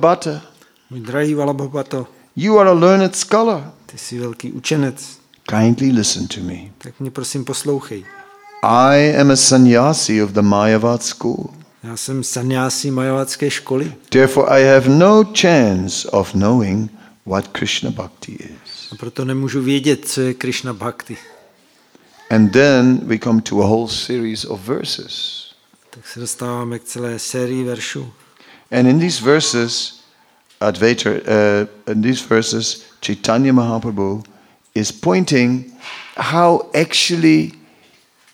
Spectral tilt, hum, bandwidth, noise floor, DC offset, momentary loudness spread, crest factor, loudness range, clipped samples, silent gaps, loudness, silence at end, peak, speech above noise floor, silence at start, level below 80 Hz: -4.5 dB/octave; none; 16.5 kHz; -53 dBFS; under 0.1%; 18 LU; 16 dB; 8 LU; under 0.1%; none; -15 LUFS; 0.85 s; 0 dBFS; 38 dB; 0 s; -56 dBFS